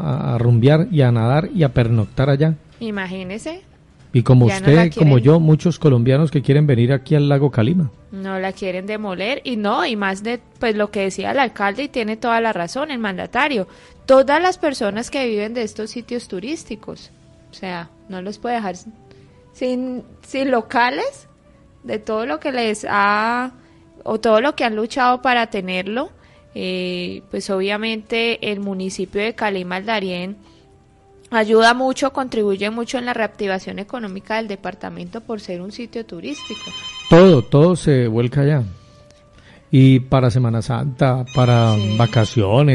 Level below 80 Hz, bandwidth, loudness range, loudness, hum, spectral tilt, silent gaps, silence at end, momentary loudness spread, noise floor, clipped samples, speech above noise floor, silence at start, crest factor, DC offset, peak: -48 dBFS; 11.5 kHz; 11 LU; -18 LUFS; none; -7 dB/octave; none; 0 s; 16 LU; -50 dBFS; under 0.1%; 33 dB; 0 s; 16 dB; under 0.1%; -2 dBFS